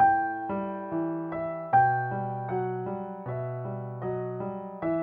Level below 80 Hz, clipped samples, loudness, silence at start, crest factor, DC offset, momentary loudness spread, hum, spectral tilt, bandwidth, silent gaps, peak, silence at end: -62 dBFS; under 0.1%; -30 LUFS; 0 s; 18 dB; under 0.1%; 12 LU; none; -11 dB/octave; 3.6 kHz; none; -10 dBFS; 0 s